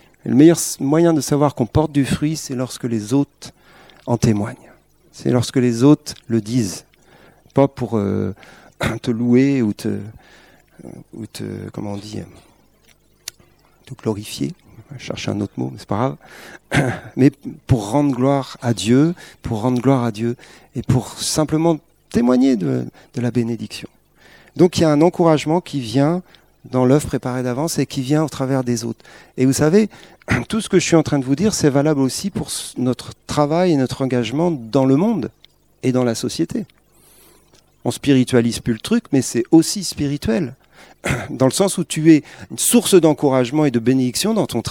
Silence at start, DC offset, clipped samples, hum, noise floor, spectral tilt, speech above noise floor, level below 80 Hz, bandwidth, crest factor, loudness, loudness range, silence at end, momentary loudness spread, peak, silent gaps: 0.25 s; 0.1%; under 0.1%; none; -55 dBFS; -5.5 dB/octave; 37 dB; -46 dBFS; 17.5 kHz; 18 dB; -18 LUFS; 9 LU; 0 s; 15 LU; 0 dBFS; none